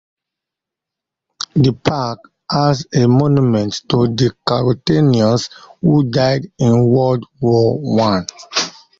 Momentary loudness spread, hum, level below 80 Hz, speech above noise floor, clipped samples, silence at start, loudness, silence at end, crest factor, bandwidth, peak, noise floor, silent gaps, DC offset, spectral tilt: 8 LU; none; -46 dBFS; 70 dB; under 0.1%; 1.55 s; -15 LUFS; 0.3 s; 14 dB; 7.6 kHz; -2 dBFS; -84 dBFS; none; under 0.1%; -6.5 dB/octave